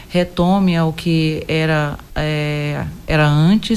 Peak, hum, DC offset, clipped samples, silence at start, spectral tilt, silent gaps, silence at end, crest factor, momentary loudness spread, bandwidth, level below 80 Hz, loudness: -2 dBFS; none; under 0.1%; under 0.1%; 0 s; -7 dB/octave; none; 0 s; 14 dB; 9 LU; 13.5 kHz; -36 dBFS; -17 LUFS